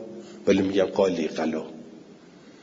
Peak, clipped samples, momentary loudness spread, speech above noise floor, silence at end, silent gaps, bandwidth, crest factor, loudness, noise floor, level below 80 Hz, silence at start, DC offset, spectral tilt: -6 dBFS; under 0.1%; 19 LU; 26 dB; 0.15 s; none; 7.8 kHz; 20 dB; -25 LUFS; -49 dBFS; -66 dBFS; 0 s; under 0.1%; -6 dB/octave